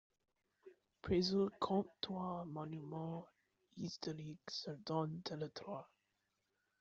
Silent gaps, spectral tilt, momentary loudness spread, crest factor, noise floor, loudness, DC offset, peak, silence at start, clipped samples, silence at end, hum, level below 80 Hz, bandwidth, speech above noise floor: none; -5.5 dB/octave; 12 LU; 20 dB; -86 dBFS; -43 LUFS; under 0.1%; -24 dBFS; 0.65 s; under 0.1%; 0.95 s; none; -70 dBFS; 7.8 kHz; 44 dB